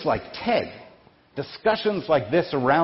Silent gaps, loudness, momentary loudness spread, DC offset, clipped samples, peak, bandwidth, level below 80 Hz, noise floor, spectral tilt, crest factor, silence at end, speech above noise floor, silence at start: none; -24 LUFS; 14 LU; under 0.1%; under 0.1%; -6 dBFS; 5.8 kHz; -52 dBFS; -53 dBFS; -9.5 dB/octave; 18 dB; 0 s; 30 dB; 0 s